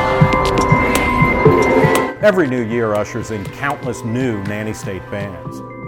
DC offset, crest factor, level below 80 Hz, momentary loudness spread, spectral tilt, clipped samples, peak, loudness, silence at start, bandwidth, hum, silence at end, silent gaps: under 0.1%; 16 dB; -32 dBFS; 13 LU; -6 dB/octave; under 0.1%; 0 dBFS; -16 LUFS; 0 s; 18 kHz; none; 0 s; none